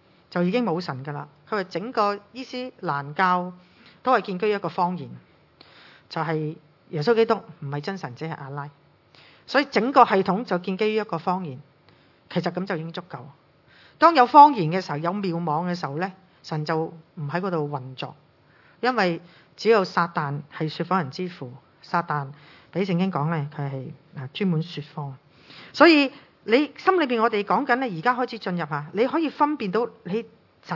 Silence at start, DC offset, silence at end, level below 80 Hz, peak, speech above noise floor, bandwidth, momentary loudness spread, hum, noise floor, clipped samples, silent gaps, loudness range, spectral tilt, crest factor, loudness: 0.3 s; under 0.1%; 0 s; -76 dBFS; 0 dBFS; 33 dB; 6 kHz; 17 LU; none; -57 dBFS; under 0.1%; none; 8 LU; -7 dB/octave; 24 dB; -23 LUFS